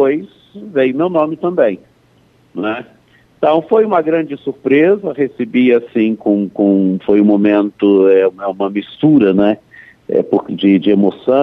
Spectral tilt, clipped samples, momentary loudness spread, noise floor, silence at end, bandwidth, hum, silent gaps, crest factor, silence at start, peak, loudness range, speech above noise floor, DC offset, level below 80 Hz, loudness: -9.5 dB/octave; under 0.1%; 10 LU; -51 dBFS; 0 s; 4 kHz; none; none; 12 dB; 0 s; 0 dBFS; 5 LU; 39 dB; under 0.1%; -58 dBFS; -14 LUFS